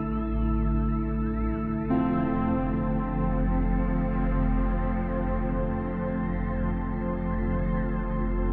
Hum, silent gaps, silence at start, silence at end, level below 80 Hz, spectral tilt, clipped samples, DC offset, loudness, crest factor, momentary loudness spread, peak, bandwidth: none; none; 0 s; 0 s; -30 dBFS; -9 dB/octave; under 0.1%; under 0.1%; -28 LUFS; 12 dB; 3 LU; -14 dBFS; 3.6 kHz